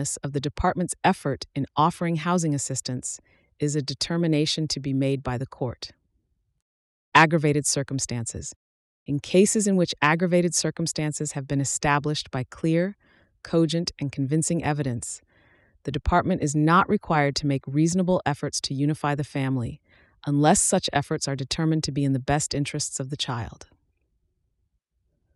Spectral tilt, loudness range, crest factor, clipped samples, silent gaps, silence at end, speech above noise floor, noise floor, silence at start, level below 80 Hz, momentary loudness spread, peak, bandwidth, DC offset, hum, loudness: -4.5 dB/octave; 4 LU; 20 dB; under 0.1%; 6.62-7.12 s, 8.56-9.06 s; 1.7 s; 50 dB; -74 dBFS; 0 s; -48 dBFS; 11 LU; -6 dBFS; 13.5 kHz; under 0.1%; none; -24 LUFS